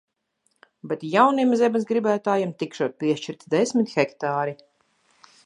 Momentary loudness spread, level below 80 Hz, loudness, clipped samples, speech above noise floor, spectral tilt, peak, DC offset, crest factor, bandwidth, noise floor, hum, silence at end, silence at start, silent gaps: 10 LU; -78 dBFS; -23 LUFS; under 0.1%; 49 dB; -5.5 dB/octave; -4 dBFS; under 0.1%; 20 dB; 10.5 kHz; -71 dBFS; none; 0.9 s; 0.85 s; none